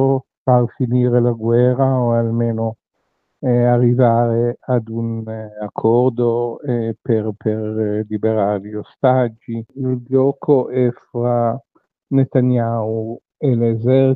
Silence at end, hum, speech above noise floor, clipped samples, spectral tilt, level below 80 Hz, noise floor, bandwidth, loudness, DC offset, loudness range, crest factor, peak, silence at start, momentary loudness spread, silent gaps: 0 s; none; 53 dB; under 0.1%; -10 dB/octave; -66 dBFS; -70 dBFS; 4 kHz; -18 LUFS; under 0.1%; 3 LU; 16 dB; 0 dBFS; 0 s; 9 LU; 0.37-0.45 s